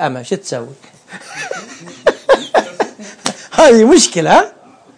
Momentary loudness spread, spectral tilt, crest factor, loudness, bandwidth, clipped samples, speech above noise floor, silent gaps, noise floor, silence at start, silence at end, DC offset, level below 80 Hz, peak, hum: 19 LU; -3.5 dB/octave; 14 dB; -12 LUFS; 10.5 kHz; under 0.1%; 22 dB; none; -32 dBFS; 0 s; 0.5 s; under 0.1%; -48 dBFS; 0 dBFS; none